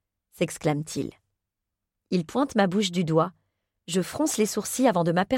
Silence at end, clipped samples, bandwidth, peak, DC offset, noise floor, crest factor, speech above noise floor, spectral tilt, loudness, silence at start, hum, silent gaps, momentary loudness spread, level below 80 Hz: 0 s; under 0.1%; 16.5 kHz; -8 dBFS; under 0.1%; -85 dBFS; 18 dB; 60 dB; -5 dB/octave; -26 LUFS; 0.4 s; none; none; 8 LU; -62 dBFS